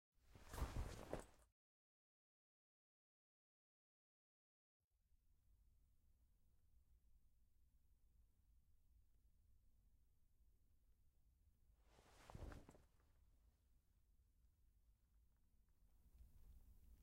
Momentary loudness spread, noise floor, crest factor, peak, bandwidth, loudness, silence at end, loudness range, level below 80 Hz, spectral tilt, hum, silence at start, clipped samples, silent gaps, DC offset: 13 LU; under -90 dBFS; 30 dB; -34 dBFS; 16 kHz; -56 LUFS; 0 s; 9 LU; -66 dBFS; -5.5 dB/octave; none; 0.2 s; under 0.1%; 1.52-4.91 s; under 0.1%